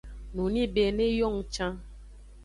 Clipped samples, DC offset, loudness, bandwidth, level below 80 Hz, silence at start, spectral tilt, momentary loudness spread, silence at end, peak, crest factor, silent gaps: under 0.1%; under 0.1%; -28 LUFS; 11.5 kHz; -42 dBFS; 0.05 s; -5.5 dB/octave; 10 LU; 0 s; -14 dBFS; 16 dB; none